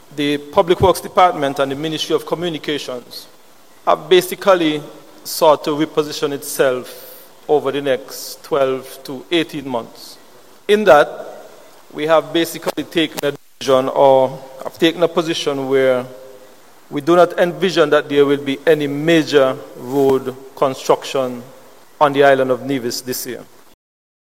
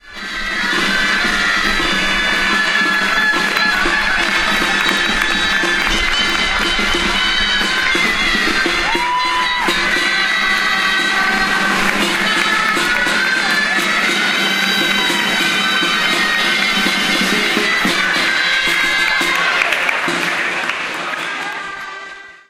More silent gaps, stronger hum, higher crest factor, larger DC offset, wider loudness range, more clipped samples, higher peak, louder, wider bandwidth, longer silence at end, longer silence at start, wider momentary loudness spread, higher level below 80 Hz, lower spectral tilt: neither; neither; about the same, 18 dB vs 16 dB; first, 0.5% vs under 0.1%; first, 4 LU vs 1 LU; neither; about the same, 0 dBFS vs 0 dBFS; about the same, -16 LUFS vs -14 LUFS; about the same, 16.5 kHz vs 16 kHz; first, 0.95 s vs 0.15 s; about the same, 0.1 s vs 0.05 s; first, 17 LU vs 3 LU; second, -54 dBFS vs -34 dBFS; first, -4.5 dB/octave vs -1.5 dB/octave